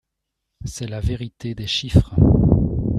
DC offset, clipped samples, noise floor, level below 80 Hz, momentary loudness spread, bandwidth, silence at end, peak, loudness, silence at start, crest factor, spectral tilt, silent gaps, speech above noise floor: under 0.1%; under 0.1%; -79 dBFS; -28 dBFS; 15 LU; 12 kHz; 0 s; -2 dBFS; -19 LUFS; 0.6 s; 18 dB; -7 dB/octave; none; 61 dB